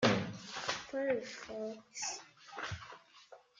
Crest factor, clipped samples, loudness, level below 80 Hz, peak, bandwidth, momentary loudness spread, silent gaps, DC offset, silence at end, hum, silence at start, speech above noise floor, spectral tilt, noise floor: 24 dB; under 0.1%; -40 LUFS; -70 dBFS; -14 dBFS; 9.6 kHz; 17 LU; none; under 0.1%; 0.25 s; none; 0 s; 20 dB; -4 dB/octave; -60 dBFS